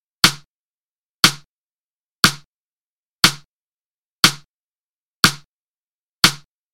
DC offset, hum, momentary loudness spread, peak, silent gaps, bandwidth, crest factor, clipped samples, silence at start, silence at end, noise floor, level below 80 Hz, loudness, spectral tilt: under 0.1%; none; 22 LU; 0 dBFS; 0.46-1.23 s, 1.47-2.23 s, 2.45-3.19 s, 3.45-4.23 s, 4.45-5.23 s, 5.45-6.22 s; 16.5 kHz; 22 dB; 0.1%; 0.25 s; 0.4 s; under -90 dBFS; -52 dBFS; -16 LUFS; -1.5 dB/octave